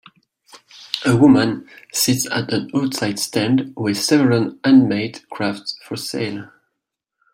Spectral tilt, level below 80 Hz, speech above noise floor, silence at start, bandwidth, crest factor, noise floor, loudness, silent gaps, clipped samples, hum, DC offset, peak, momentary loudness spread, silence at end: -4.5 dB/octave; -58 dBFS; 62 dB; 0.55 s; 16.5 kHz; 18 dB; -79 dBFS; -18 LUFS; none; under 0.1%; none; under 0.1%; 0 dBFS; 14 LU; 0.9 s